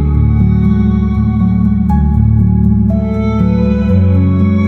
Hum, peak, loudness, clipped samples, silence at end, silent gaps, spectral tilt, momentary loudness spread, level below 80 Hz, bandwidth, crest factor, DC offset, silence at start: none; -2 dBFS; -11 LUFS; under 0.1%; 0 s; none; -11 dB/octave; 2 LU; -18 dBFS; 4.2 kHz; 8 dB; 0.5%; 0 s